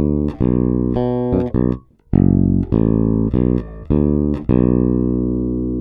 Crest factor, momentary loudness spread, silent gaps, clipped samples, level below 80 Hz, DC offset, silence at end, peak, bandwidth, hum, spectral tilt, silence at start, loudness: 16 dB; 6 LU; none; under 0.1%; -26 dBFS; under 0.1%; 0 s; 0 dBFS; 3.9 kHz; 60 Hz at -40 dBFS; -13 dB/octave; 0 s; -17 LUFS